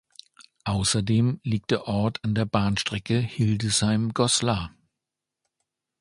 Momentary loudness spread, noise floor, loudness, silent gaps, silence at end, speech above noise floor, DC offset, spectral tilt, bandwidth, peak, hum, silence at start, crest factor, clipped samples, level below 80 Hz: 6 LU; -86 dBFS; -24 LUFS; none; 1.3 s; 62 dB; under 0.1%; -4.5 dB/octave; 11.5 kHz; -6 dBFS; none; 0.4 s; 20 dB; under 0.1%; -48 dBFS